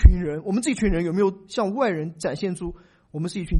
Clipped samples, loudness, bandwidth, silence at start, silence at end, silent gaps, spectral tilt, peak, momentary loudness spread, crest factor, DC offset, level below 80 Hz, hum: under 0.1%; -25 LUFS; 11.5 kHz; 0 s; 0 s; none; -6.5 dB/octave; 0 dBFS; 9 LU; 22 dB; under 0.1%; -24 dBFS; none